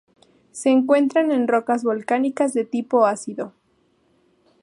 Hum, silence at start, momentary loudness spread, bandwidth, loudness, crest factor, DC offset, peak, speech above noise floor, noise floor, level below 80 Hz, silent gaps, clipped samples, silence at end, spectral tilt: none; 0.55 s; 13 LU; 11.5 kHz; -20 LUFS; 18 dB; under 0.1%; -4 dBFS; 44 dB; -63 dBFS; -76 dBFS; none; under 0.1%; 1.15 s; -5 dB/octave